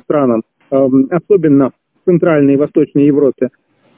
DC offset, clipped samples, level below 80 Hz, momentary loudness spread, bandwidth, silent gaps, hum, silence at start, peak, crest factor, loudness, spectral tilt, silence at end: under 0.1%; under 0.1%; -54 dBFS; 8 LU; 3.4 kHz; none; none; 0.1 s; 0 dBFS; 12 dB; -12 LUFS; -13 dB/octave; 0.5 s